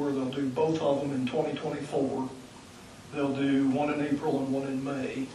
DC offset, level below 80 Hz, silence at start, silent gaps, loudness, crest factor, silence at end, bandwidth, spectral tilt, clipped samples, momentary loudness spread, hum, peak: under 0.1%; -64 dBFS; 0 s; none; -30 LUFS; 16 dB; 0 s; 12 kHz; -6.5 dB/octave; under 0.1%; 14 LU; none; -14 dBFS